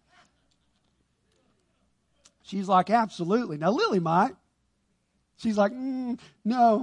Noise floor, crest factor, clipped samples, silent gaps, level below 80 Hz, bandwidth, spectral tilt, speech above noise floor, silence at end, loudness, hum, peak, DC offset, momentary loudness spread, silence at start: -73 dBFS; 20 dB; under 0.1%; none; -70 dBFS; 10.5 kHz; -6.5 dB/octave; 48 dB; 0 s; -26 LUFS; none; -8 dBFS; under 0.1%; 11 LU; 2.5 s